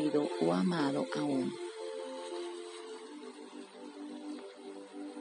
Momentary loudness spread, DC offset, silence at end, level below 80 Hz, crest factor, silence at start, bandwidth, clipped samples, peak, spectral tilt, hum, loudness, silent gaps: 17 LU; under 0.1%; 0 s; -88 dBFS; 20 dB; 0 s; 10 kHz; under 0.1%; -16 dBFS; -6 dB/octave; none; -37 LUFS; none